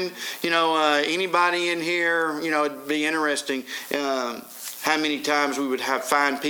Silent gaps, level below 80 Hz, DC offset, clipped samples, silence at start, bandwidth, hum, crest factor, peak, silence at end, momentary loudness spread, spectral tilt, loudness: none; -80 dBFS; under 0.1%; under 0.1%; 0 s; over 20 kHz; none; 20 dB; -4 dBFS; 0 s; 8 LU; -2.5 dB/octave; -23 LUFS